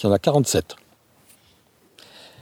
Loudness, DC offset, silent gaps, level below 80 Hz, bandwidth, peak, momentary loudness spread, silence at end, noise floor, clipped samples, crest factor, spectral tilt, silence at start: -20 LUFS; under 0.1%; none; -54 dBFS; 18 kHz; -4 dBFS; 26 LU; 1.7 s; -58 dBFS; under 0.1%; 20 dB; -5 dB/octave; 0 s